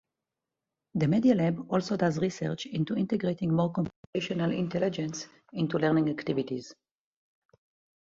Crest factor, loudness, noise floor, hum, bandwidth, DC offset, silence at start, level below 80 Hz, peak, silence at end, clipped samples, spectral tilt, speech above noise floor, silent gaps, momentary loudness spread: 18 dB; -29 LUFS; -88 dBFS; none; 7.8 kHz; under 0.1%; 0.95 s; -64 dBFS; -12 dBFS; 1.3 s; under 0.1%; -7 dB/octave; 60 dB; 3.96-4.13 s; 11 LU